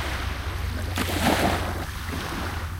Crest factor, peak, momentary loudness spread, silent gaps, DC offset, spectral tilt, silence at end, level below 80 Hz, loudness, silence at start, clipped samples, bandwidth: 20 dB; -8 dBFS; 9 LU; none; under 0.1%; -4.5 dB/octave; 0 s; -34 dBFS; -27 LUFS; 0 s; under 0.1%; 17 kHz